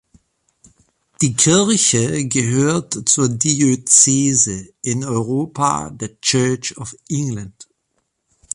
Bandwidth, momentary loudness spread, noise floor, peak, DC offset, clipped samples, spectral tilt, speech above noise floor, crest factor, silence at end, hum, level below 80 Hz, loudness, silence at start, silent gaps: 11.5 kHz; 14 LU; -70 dBFS; 0 dBFS; under 0.1%; under 0.1%; -3.5 dB/octave; 53 dB; 18 dB; 0.9 s; none; -52 dBFS; -16 LUFS; 1.2 s; none